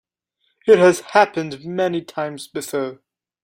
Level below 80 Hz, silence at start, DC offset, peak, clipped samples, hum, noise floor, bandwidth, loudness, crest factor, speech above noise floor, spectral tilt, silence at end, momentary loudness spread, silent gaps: -64 dBFS; 0.65 s; under 0.1%; 0 dBFS; under 0.1%; none; -70 dBFS; 16 kHz; -19 LUFS; 20 dB; 52 dB; -5 dB/octave; 0.5 s; 14 LU; none